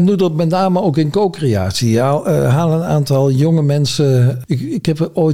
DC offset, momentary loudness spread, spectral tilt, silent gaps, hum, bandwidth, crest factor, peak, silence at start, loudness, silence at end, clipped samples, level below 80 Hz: 0.7%; 4 LU; -7 dB/octave; none; none; 15.5 kHz; 10 dB; -4 dBFS; 0 s; -14 LUFS; 0 s; under 0.1%; -48 dBFS